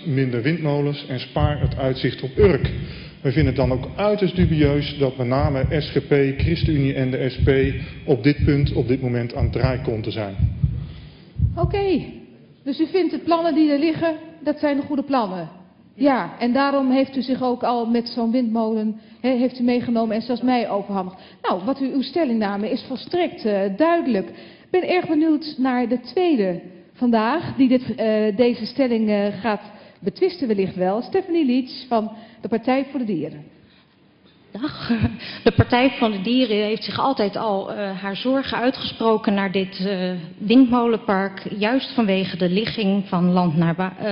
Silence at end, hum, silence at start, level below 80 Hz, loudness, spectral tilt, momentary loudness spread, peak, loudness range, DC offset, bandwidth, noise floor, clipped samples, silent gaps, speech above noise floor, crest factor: 0 s; none; 0 s; -38 dBFS; -21 LUFS; -10.5 dB/octave; 8 LU; -4 dBFS; 3 LU; under 0.1%; 5.6 kHz; -55 dBFS; under 0.1%; none; 34 dB; 16 dB